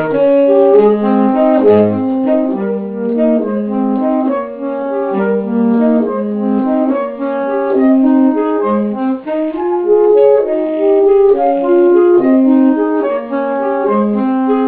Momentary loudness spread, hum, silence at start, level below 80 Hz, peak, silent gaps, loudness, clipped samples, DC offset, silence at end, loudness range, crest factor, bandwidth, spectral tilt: 8 LU; none; 0 s; -50 dBFS; 0 dBFS; none; -12 LUFS; under 0.1%; under 0.1%; 0 s; 5 LU; 12 dB; 4.2 kHz; -12 dB/octave